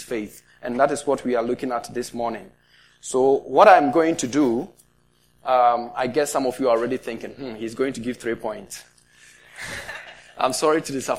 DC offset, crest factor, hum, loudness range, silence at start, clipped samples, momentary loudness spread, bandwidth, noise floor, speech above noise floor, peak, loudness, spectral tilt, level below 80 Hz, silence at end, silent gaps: 0.2%; 22 dB; 60 Hz at -55 dBFS; 10 LU; 0 s; under 0.1%; 18 LU; 16 kHz; -62 dBFS; 40 dB; 0 dBFS; -21 LUFS; -4 dB/octave; -60 dBFS; 0 s; none